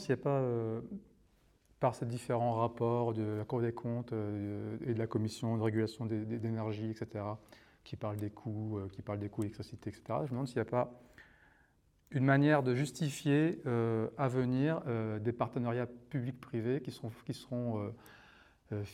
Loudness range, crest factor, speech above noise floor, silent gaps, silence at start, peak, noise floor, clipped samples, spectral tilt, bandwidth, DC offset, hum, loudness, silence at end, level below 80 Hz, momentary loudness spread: 8 LU; 20 dB; 35 dB; none; 0 s; -16 dBFS; -70 dBFS; under 0.1%; -7.5 dB/octave; 14 kHz; under 0.1%; none; -36 LUFS; 0 s; -70 dBFS; 11 LU